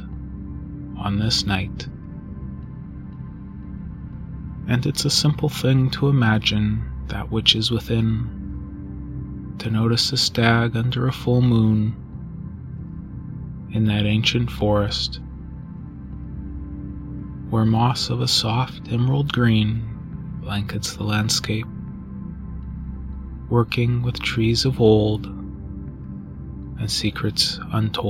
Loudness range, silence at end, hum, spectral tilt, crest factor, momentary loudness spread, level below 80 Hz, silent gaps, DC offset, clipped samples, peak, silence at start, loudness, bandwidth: 6 LU; 0 s; none; -5 dB/octave; 22 dB; 17 LU; -38 dBFS; none; under 0.1%; under 0.1%; 0 dBFS; 0 s; -21 LUFS; 16 kHz